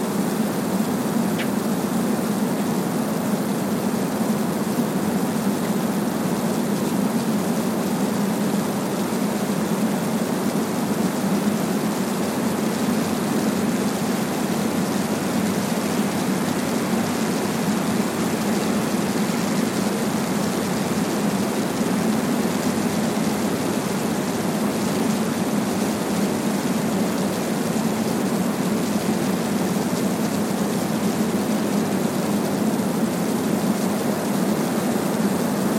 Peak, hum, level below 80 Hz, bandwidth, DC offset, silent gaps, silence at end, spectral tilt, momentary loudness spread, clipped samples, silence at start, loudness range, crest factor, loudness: -8 dBFS; none; -58 dBFS; 16.5 kHz; under 0.1%; none; 0 s; -5 dB/octave; 1 LU; under 0.1%; 0 s; 1 LU; 14 dB; -22 LUFS